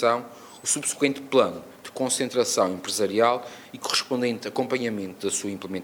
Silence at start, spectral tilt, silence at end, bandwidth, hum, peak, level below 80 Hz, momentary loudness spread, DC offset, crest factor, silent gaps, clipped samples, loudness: 0 s; -2.5 dB/octave; 0 s; over 20 kHz; none; -6 dBFS; -72 dBFS; 10 LU; under 0.1%; 20 dB; none; under 0.1%; -25 LUFS